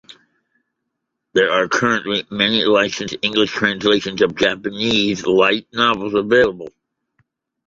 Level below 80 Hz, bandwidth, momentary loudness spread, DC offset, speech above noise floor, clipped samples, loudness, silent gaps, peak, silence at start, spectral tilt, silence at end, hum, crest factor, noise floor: -54 dBFS; 7.8 kHz; 6 LU; under 0.1%; 60 dB; under 0.1%; -17 LUFS; none; 0 dBFS; 0.1 s; -4 dB/octave; 1 s; none; 18 dB; -77 dBFS